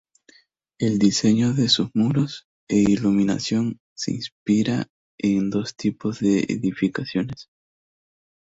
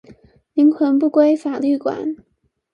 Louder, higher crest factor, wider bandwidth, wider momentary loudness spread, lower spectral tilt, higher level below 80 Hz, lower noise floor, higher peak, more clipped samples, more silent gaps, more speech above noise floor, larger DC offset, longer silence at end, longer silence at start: second, -22 LUFS vs -17 LUFS; about the same, 18 dB vs 16 dB; first, 8 kHz vs 7 kHz; about the same, 10 LU vs 12 LU; second, -5.5 dB/octave vs -7 dB/octave; first, -56 dBFS vs -64 dBFS; first, -59 dBFS vs -48 dBFS; second, -6 dBFS vs -2 dBFS; neither; first, 2.44-2.67 s, 3.80-3.96 s, 4.32-4.46 s, 4.90-5.18 s vs none; first, 38 dB vs 32 dB; neither; first, 1.05 s vs 0.6 s; first, 0.8 s vs 0.55 s